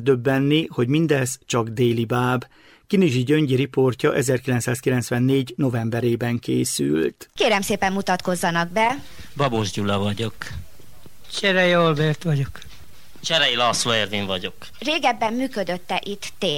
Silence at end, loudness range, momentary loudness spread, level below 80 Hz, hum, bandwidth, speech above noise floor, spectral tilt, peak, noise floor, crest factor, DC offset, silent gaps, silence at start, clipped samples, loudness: 0 s; 2 LU; 9 LU; -52 dBFS; none; 16.5 kHz; 27 dB; -5 dB/octave; -6 dBFS; -48 dBFS; 16 dB; under 0.1%; none; 0 s; under 0.1%; -21 LUFS